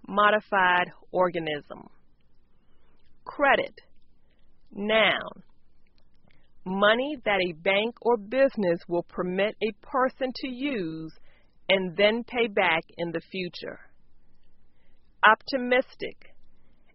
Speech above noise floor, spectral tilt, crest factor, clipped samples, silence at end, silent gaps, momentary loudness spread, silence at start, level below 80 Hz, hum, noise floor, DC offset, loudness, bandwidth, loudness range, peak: 28 dB; -2 dB/octave; 24 dB; under 0.1%; 0.25 s; none; 17 LU; 0.1 s; -58 dBFS; none; -54 dBFS; under 0.1%; -25 LUFS; 5.8 kHz; 4 LU; -2 dBFS